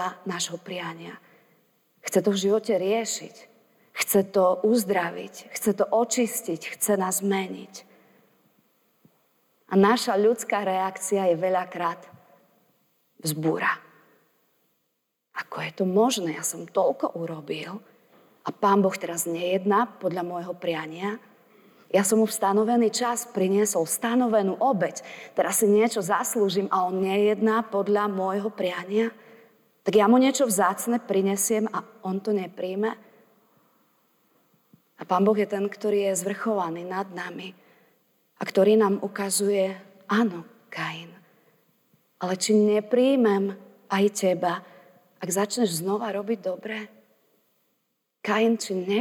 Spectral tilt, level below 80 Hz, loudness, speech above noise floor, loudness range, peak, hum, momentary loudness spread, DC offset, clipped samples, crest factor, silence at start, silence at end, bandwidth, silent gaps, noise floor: -4.5 dB/octave; -78 dBFS; -25 LUFS; 52 dB; 6 LU; -8 dBFS; none; 14 LU; under 0.1%; under 0.1%; 16 dB; 0 s; 0 s; 19.5 kHz; none; -77 dBFS